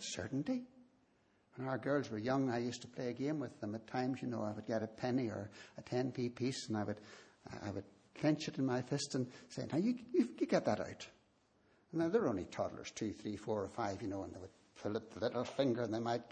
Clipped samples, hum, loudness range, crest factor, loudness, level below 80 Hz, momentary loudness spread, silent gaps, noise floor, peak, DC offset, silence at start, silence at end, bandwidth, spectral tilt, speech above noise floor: under 0.1%; none; 3 LU; 20 dB; -40 LUFS; -74 dBFS; 12 LU; none; -74 dBFS; -20 dBFS; under 0.1%; 0 s; 0 s; 9.4 kHz; -6 dB/octave; 35 dB